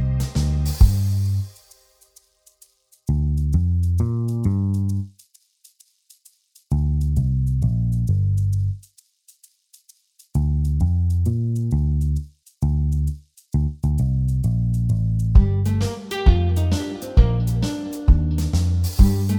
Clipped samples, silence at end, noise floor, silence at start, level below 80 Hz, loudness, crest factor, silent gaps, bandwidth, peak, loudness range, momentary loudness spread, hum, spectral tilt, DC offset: under 0.1%; 0 s; -56 dBFS; 0 s; -24 dBFS; -21 LUFS; 18 dB; none; 19.5 kHz; -2 dBFS; 5 LU; 8 LU; none; -7.5 dB/octave; under 0.1%